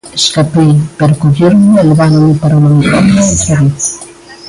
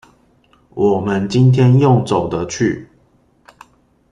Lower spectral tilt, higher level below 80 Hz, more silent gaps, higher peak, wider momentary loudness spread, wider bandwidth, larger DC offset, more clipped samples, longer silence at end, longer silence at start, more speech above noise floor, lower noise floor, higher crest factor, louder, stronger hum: second, -5.5 dB/octave vs -7.5 dB/octave; first, -32 dBFS vs -48 dBFS; neither; about the same, 0 dBFS vs -2 dBFS; second, 5 LU vs 10 LU; first, 11.5 kHz vs 9.6 kHz; neither; neither; second, 0 s vs 1.3 s; second, 0.05 s vs 0.75 s; second, 24 dB vs 42 dB; second, -31 dBFS vs -55 dBFS; second, 8 dB vs 14 dB; first, -8 LUFS vs -15 LUFS; neither